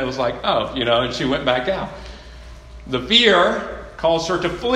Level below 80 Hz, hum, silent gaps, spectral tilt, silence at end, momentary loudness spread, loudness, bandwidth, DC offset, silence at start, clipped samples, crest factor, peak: -40 dBFS; none; none; -4 dB/octave; 0 s; 18 LU; -18 LUFS; 12 kHz; under 0.1%; 0 s; under 0.1%; 20 dB; 0 dBFS